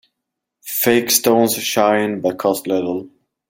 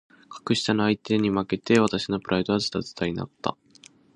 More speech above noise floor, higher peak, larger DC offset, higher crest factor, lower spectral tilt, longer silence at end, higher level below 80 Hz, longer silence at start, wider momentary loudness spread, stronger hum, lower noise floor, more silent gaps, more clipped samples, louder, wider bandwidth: first, 63 dB vs 29 dB; first, 0 dBFS vs -6 dBFS; neither; about the same, 18 dB vs 20 dB; second, -3 dB/octave vs -5.5 dB/octave; second, 0.4 s vs 0.65 s; second, -62 dBFS vs -56 dBFS; first, 0.65 s vs 0.3 s; about the same, 11 LU vs 11 LU; neither; first, -80 dBFS vs -54 dBFS; neither; neither; first, -17 LUFS vs -25 LUFS; first, 16.5 kHz vs 10 kHz